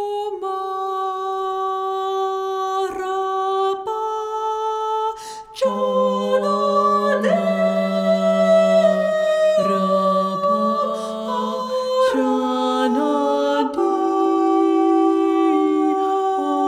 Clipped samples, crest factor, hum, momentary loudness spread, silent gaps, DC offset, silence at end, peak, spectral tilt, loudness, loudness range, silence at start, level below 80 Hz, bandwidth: under 0.1%; 14 dB; none; 7 LU; none; under 0.1%; 0 s; -6 dBFS; -6 dB/octave; -19 LUFS; 5 LU; 0 s; -64 dBFS; 13.5 kHz